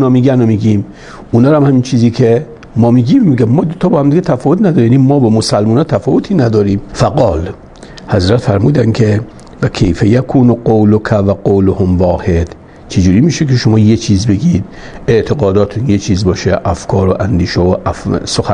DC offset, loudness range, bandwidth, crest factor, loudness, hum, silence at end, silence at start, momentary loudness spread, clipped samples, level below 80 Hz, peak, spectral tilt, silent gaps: under 0.1%; 3 LU; 10.5 kHz; 10 dB; -11 LUFS; none; 0 s; 0 s; 7 LU; under 0.1%; -34 dBFS; 0 dBFS; -7.5 dB/octave; none